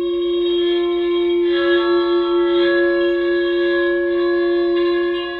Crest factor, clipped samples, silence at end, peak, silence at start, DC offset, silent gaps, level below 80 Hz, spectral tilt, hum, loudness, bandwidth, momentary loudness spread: 10 dB; under 0.1%; 0 s; -6 dBFS; 0 s; under 0.1%; none; -50 dBFS; -6.5 dB/octave; none; -17 LUFS; 4.8 kHz; 3 LU